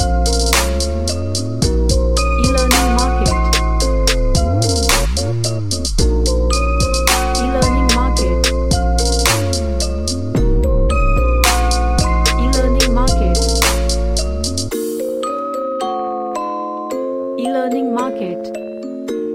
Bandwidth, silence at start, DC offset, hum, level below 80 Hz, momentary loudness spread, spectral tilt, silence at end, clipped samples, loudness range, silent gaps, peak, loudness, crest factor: 16.5 kHz; 0 s; 2%; none; -18 dBFS; 8 LU; -4 dB/octave; 0 s; under 0.1%; 6 LU; none; 0 dBFS; -16 LUFS; 16 dB